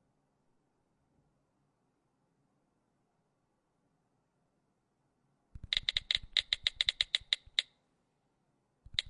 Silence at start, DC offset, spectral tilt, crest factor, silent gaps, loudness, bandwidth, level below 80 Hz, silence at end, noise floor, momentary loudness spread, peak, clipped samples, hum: 5.55 s; under 0.1%; 0.5 dB/octave; 30 dB; none; -32 LUFS; 11.5 kHz; -62 dBFS; 0 s; -79 dBFS; 5 LU; -10 dBFS; under 0.1%; none